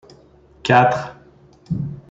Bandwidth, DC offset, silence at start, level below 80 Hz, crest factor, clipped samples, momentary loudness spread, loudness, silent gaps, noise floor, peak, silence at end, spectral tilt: 7.8 kHz; under 0.1%; 0.65 s; -50 dBFS; 20 dB; under 0.1%; 14 LU; -19 LUFS; none; -50 dBFS; -2 dBFS; 0.1 s; -6.5 dB/octave